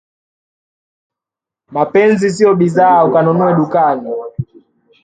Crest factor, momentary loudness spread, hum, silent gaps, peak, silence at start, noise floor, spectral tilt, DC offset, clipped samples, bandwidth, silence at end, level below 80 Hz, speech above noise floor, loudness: 14 dB; 14 LU; none; none; 0 dBFS; 1.7 s; -86 dBFS; -7.5 dB/octave; under 0.1%; under 0.1%; 9.2 kHz; 0.6 s; -54 dBFS; 75 dB; -12 LUFS